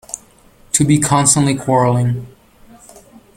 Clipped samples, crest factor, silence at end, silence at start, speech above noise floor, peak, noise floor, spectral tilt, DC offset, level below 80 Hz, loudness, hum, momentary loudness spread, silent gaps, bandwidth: under 0.1%; 16 dB; 1.1 s; 0.1 s; 34 dB; 0 dBFS; -47 dBFS; -4.5 dB/octave; under 0.1%; -46 dBFS; -14 LUFS; none; 15 LU; none; 16.5 kHz